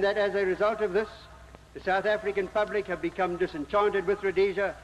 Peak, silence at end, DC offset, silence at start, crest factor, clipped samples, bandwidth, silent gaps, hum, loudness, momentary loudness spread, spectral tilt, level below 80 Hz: -14 dBFS; 0 s; under 0.1%; 0 s; 14 dB; under 0.1%; 10.5 kHz; none; none; -28 LUFS; 7 LU; -6 dB/octave; -54 dBFS